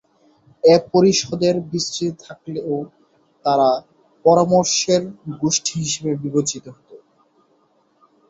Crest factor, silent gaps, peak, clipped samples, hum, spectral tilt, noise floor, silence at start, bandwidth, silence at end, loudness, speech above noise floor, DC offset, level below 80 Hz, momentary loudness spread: 18 dB; none; -2 dBFS; under 0.1%; none; -4.5 dB/octave; -61 dBFS; 0.65 s; 8.2 kHz; 1.35 s; -18 LUFS; 43 dB; under 0.1%; -60 dBFS; 13 LU